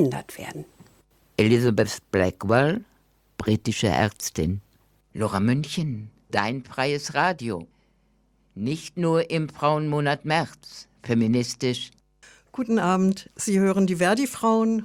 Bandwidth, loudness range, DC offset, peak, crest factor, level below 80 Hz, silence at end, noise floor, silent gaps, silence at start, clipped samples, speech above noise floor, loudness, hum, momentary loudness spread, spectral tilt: 17 kHz; 3 LU; under 0.1%; -4 dBFS; 20 dB; -56 dBFS; 0 s; -64 dBFS; none; 0 s; under 0.1%; 41 dB; -24 LUFS; none; 14 LU; -5.5 dB/octave